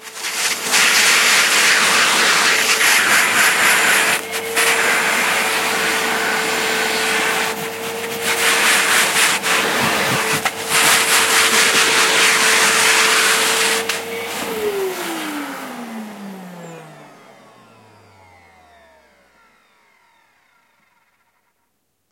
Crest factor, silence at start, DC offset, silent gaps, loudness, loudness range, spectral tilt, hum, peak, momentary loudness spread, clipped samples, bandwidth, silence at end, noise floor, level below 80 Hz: 18 dB; 0 s; under 0.1%; none; -14 LUFS; 14 LU; 0 dB/octave; none; 0 dBFS; 13 LU; under 0.1%; 16.5 kHz; 5.05 s; -69 dBFS; -66 dBFS